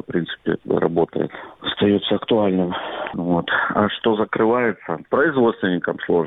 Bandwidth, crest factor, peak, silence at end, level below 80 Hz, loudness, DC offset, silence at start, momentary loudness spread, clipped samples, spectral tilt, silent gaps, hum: 4.1 kHz; 20 dB; 0 dBFS; 0 s; -54 dBFS; -20 LUFS; under 0.1%; 0.1 s; 9 LU; under 0.1%; -9 dB/octave; none; none